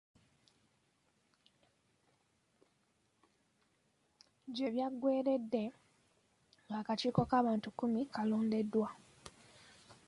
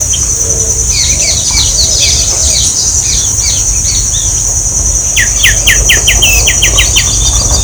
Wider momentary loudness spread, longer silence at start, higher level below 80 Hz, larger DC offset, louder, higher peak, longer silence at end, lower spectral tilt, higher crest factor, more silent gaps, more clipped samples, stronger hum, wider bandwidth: first, 19 LU vs 4 LU; first, 4.45 s vs 0 s; second, -72 dBFS vs -18 dBFS; neither; second, -36 LUFS vs -6 LUFS; second, -18 dBFS vs 0 dBFS; first, 0.15 s vs 0 s; first, -7 dB/octave vs -0.5 dB/octave; first, 20 dB vs 8 dB; neither; second, under 0.1% vs 1%; neither; second, 11 kHz vs over 20 kHz